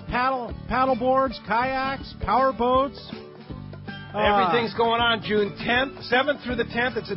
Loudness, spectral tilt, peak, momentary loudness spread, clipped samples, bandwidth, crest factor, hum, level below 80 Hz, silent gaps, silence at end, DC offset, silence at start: -23 LUFS; -9.5 dB/octave; -8 dBFS; 17 LU; under 0.1%; 5.8 kHz; 16 dB; none; -44 dBFS; none; 0 s; under 0.1%; 0 s